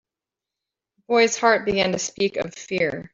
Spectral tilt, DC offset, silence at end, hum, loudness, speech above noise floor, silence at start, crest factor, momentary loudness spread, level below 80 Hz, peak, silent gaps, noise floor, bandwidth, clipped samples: -3 dB/octave; under 0.1%; 0.05 s; none; -21 LUFS; 66 dB; 1.1 s; 20 dB; 7 LU; -58 dBFS; -2 dBFS; none; -88 dBFS; 7.8 kHz; under 0.1%